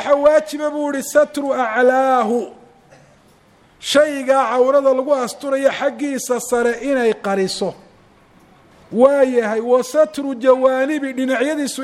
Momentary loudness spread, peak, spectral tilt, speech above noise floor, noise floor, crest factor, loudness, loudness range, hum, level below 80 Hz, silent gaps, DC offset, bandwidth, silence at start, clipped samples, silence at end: 8 LU; 0 dBFS; -3.5 dB/octave; 35 dB; -51 dBFS; 18 dB; -17 LUFS; 3 LU; none; -58 dBFS; none; under 0.1%; 14.5 kHz; 0 s; under 0.1%; 0 s